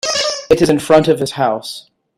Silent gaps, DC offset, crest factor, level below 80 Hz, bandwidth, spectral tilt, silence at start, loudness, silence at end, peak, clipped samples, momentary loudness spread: none; under 0.1%; 14 dB; -46 dBFS; 15.5 kHz; -4.5 dB/octave; 0.05 s; -14 LUFS; 0.35 s; 0 dBFS; under 0.1%; 14 LU